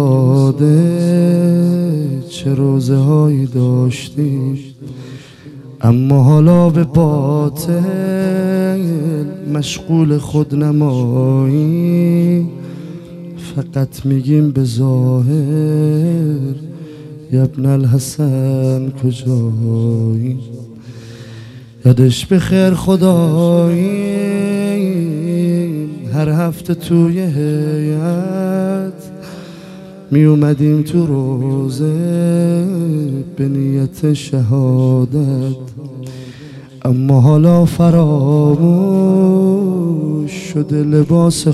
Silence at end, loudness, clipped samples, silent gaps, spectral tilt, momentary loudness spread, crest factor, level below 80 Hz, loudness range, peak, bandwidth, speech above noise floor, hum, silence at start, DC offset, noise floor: 0 s; -14 LUFS; under 0.1%; none; -8 dB/octave; 18 LU; 14 dB; -46 dBFS; 4 LU; 0 dBFS; 13.5 kHz; 22 dB; none; 0 s; under 0.1%; -34 dBFS